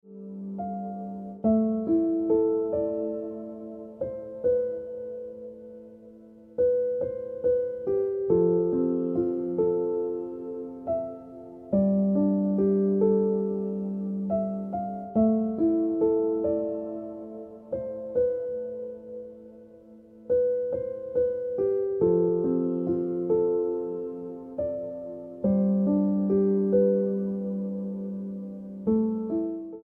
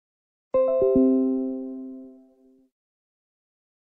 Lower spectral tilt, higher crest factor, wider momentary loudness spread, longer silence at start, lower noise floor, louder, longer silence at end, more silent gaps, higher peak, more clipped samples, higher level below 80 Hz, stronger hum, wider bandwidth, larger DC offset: about the same, -13 dB/octave vs -12 dB/octave; about the same, 16 dB vs 16 dB; second, 15 LU vs 19 LU; second, 0.05 s vs 0.55 s; second, -50 dBFS vs -58 dBFS; second, -27 LUFS vs -23 LUFS; second, 0 s vs 1.9 s; neither; about the same, -12 dBFS vs -10 dBFS; neither; about the same, -60 dBFS vs -56 dBFS; neither; second, 2.2 kHz vs 2.8 kHz; neither